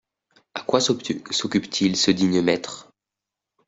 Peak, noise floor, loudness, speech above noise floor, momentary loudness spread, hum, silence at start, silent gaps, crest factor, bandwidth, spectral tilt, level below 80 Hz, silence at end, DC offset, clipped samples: -4 dBFS; -87 dBFS; -22 LUFS; 65 dB; 15 LU; none; 0.55 s; none; 20 dB; 8.2 kHz; -4 dB/octave; -62 dBFS; 0.85 s; under 0.1%; under 0.1%